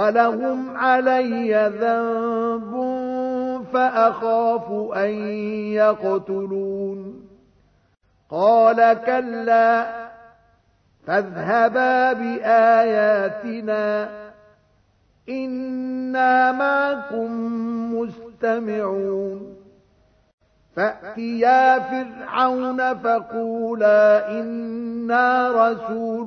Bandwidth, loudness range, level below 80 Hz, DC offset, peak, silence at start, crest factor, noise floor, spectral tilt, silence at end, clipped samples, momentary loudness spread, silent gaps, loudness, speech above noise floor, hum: 6.4 kHz; 6 LU; -64 dBFS; under 0.1%; -2 dBFS; 0 s; 18 dB; -60 dBFS; -7 dB/octave; 0 s; under 0.1%; 12 LU; 20.33-20.38 s; -20 LUFS; 41 dB; none